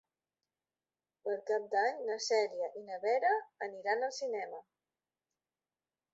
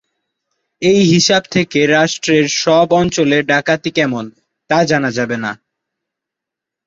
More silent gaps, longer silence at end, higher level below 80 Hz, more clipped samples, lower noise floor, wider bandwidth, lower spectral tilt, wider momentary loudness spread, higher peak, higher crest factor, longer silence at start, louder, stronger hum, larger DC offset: neither; first, 1.55 s vs 1.35 s; second, under -90 dBFS vs -50 dBFS; neither; first, under -90 dBFS vs -83 dBFS; about the same, 8 kHz vs 8 kHz; second, 1 dB/octave vs -4.5 dB/octave; about the same, 10 LU vs 9 LU; second, -18 dBFS vs -2 dBFS; about the same, 18 dB vs 14 dB; first, 1.25 s vs 0.8 s; second, -35 LUFS vs -13 LUFS; neither; neither